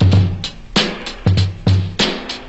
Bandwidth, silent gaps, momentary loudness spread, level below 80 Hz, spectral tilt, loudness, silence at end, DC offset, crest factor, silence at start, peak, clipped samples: 8.2 kHz; none; 5 LU; -34 dBFS; -5.5 dB/octave; -17 LUFS; 0 s; under 0.1%; 12 dB; 0 s; -4 dBFS; under 0.1%